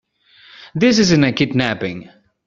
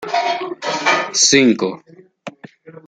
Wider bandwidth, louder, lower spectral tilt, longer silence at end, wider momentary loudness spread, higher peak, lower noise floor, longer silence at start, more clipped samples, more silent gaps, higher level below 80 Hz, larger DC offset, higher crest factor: second, 7.6 kHz vs 10.5 kHz; about the same, -16 LUFS vs -15 LUFS; first, -4.5 dB/octave vs -2 dB/octave; first, 0.45 s vs 0.1 s; second, 15 LU vs 25 LU; about the same, -2 dBFS vs 0 dBFS; first, -49 dBFS vs -40 dBFS; first, 0.6 s vs 0 s; neither; neither; first, -50 dBFS vs -62 dBFS; neither; about the same, 16 dB vs 18 dB